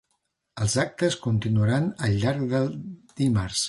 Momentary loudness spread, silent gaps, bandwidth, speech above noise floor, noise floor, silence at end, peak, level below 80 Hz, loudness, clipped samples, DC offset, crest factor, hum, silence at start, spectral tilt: 7 LU; none; 11.5 kHz; 51 dB; -75 dBFS; 0 s; -10 dBFS; -48 dBFS; -25 LUFS; under 0.1%; under 0.1%; 16 dB; none; 0.55 s; -5.5 dB/octave